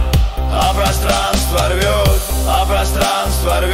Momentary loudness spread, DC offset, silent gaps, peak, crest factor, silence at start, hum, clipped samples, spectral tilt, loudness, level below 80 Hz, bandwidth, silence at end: 2 LU; under 0.1%; none; -2 dBFS; 12 dB; 0 s; none; under 0.1%; -4 dB/octave; -15 LUFS; -18 dBFS; 16.5 kHz; 0 s